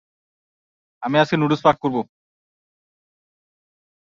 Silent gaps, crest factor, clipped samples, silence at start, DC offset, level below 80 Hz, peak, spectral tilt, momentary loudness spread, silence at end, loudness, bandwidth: none; 22 dB; under 0.1%; 1 s; under 0.1%; -62 dBFS; -2 dBFS; -7 dB/octave; 13 LU; 2.1 s; -19 LUFS; 7.6 kHz